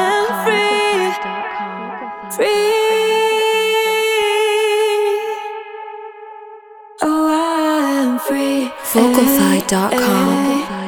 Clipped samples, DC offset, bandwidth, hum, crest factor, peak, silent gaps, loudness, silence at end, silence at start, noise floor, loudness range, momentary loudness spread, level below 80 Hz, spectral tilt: under 0.1%; under 0.1%; over 20 kHz; none; 16 dB; 0 dBFS; none; -16 LUFS; 0 s; 0 s; -39 dBFS; 4 LU; 14 LU; -54 dBFS; -4 dB/octave